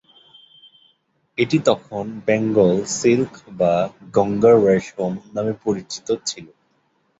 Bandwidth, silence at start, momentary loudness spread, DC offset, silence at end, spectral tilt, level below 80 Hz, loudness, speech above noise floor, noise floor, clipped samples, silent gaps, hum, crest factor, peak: 8 kHz; 1.4 s; 12 LU; under 0.1%; 0.75 s; -5.5 dB/octave; -56 dBFS; -19 LUFS; 46 dB; -65 dBFS; under 0.1%; none; none; 18 dB; -2 dBFS